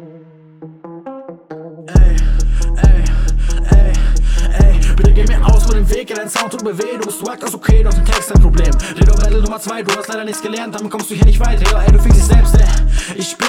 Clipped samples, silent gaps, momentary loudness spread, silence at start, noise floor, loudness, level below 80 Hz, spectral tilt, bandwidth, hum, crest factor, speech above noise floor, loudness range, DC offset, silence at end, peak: under 0.1%; none; 11 LU; 0 s; -40 dBFS; -14 LUFS; -12 dBFS; -5.5 dB/octave; 14 kHz; none; 10 dB; 29 dB; 2 LU; under 0.1%; 0 s; 0 dBFS